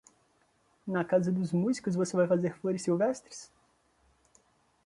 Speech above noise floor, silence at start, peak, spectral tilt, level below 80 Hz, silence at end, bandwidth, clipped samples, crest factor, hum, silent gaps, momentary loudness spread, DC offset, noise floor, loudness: 40 dB; 0.85 s; -14 dBFS; -6.5 dB/octave; -72 dBFS; 1.4 s; 11.5 kHz; under 0.1%; 18 dB; none; none; 13 LU; under 0.1%; -70 dBFS; -30 LUFS